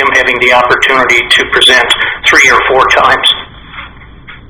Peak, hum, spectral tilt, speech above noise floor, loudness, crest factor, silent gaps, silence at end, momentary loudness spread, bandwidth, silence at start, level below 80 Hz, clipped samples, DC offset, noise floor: 0 dBFS; none; -1.5 dB/octave; 24 dB; -6 LUFS; 8 dB; none; 0.1 s; 14 LU; over 20 kHz; 0 s; -36 dBFS; 3%; under 0.1%; -31 dBFS